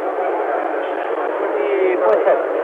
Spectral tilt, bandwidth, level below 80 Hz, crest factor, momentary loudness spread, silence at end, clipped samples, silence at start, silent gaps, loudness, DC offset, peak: -5.5 dB/octave; 4.7 kHz; -70 dBFS; 14 dB; 6 LU; 0 s; under 0.1%; 0 s; none; -18 LUFS; under 0.1%; -4 dBFS